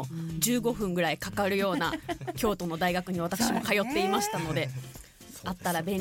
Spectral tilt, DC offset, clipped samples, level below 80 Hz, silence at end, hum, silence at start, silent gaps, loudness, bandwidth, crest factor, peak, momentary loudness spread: -4 dB/octave; under 0.1%; under 0.1%; -52 dBFS; 0 s; none; 0 s; none; -29 LUFS; 17 kHz; 20 dB; -10 dBFS; 10 LU